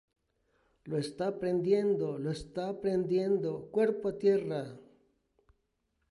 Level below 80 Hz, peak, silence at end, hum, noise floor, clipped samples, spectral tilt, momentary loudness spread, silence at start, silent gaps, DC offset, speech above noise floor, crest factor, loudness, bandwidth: -66 dBFS; -16 dBFS; 1.3 s; none; -79 dBFS; under 0.1%; -7.5 dB/octave; 9 LU; 0.85 s; none; under 0.1%; 48 dB; 16 dB; -32 LUFS; 11.5 kHz